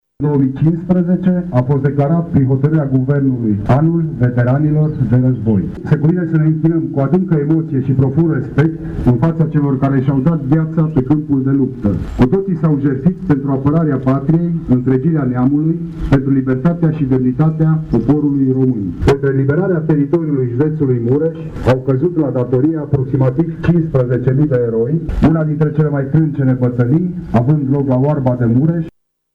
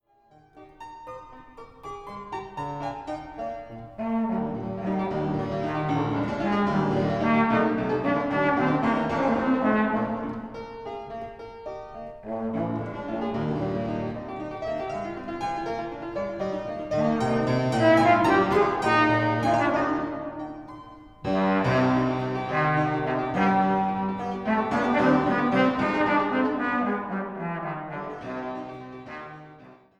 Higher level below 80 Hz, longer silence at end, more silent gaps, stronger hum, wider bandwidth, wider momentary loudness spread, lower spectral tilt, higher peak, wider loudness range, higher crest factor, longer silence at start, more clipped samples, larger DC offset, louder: first, -34 dBFS vs -52 dBFS; first, 0.45 s vs 0.25 s; neither; neither; second, 5.6 kHz vs 11.5 kHz; second, 3 LU vs 17 LU; first, -10.5 dB/octave vs -7.5 dB/octave; first, -2 dBFS vs -8 dBFS; second, 1 LU vs 10 LU; second, 12 dB vs 18 dB; second, 0.2 s vs 0.55 s; neither; neither; first, -14 LUFS vs -25 LUFS